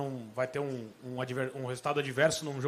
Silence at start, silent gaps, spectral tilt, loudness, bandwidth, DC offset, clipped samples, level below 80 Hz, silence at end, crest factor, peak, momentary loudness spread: 0 s; none; -4.5 dB/octave; -33 LUFS; 15 kHz; under 0.1%; under 0.1%; -70 dBFS; 0 s; 20 dB; -14 dBFS; 10 LU